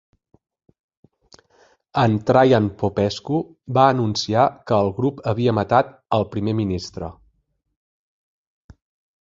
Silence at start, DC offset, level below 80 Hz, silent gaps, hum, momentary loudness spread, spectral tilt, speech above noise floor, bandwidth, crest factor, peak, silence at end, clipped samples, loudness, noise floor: 1.95 s; under 0.1%; -48 dBFS; none; none; 9 LU; -6.5 dB/octave; 47 dB; 7.6 kHz; 20 dB; -2 dBFS; 2.1 s; under 0.1%; -20 LUFS; -66 dBFS